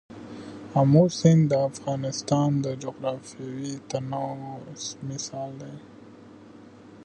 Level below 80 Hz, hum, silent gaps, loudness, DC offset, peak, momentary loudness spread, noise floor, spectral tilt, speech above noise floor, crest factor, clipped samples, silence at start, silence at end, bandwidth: -64 dBFS; none; none; -25 LUFS; under 0.1%; -4 dBFS; 21 LU; -48 dBFS; -6.5 dB/octave; 23 dB; 22 dB; under 0.1%; 0.1 s; 0 s; 9.4 kHz